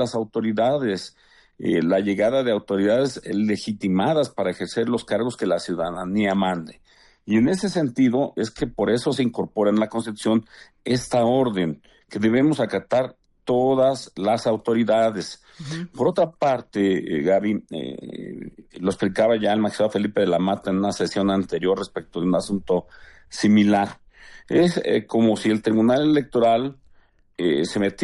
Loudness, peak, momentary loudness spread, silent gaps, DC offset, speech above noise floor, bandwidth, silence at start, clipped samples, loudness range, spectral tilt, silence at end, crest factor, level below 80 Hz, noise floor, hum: -22 LUFS; -8 dBFS; 11 LU; none; under 0.1%; 34 dB; 11.5 kHz; 0 s; under 0.1%; 3 LU; -6 dB/octave; 0 s; 14 dB; -56 dBFS; -55 dBFS; none